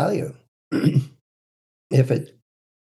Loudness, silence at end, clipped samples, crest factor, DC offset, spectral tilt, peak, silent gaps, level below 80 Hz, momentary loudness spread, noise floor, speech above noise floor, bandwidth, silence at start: -22 LUFS; 0.7 s; under 0.1%; 18 dB; under 0.1%; -8 dB/octave; -6 dBFS; 0.48-0.71 s, 1.21-1.90 s; -68 dBFS; 16 LU; under -90 dBFS; over 70 dB; 12.5 kHz; 0 s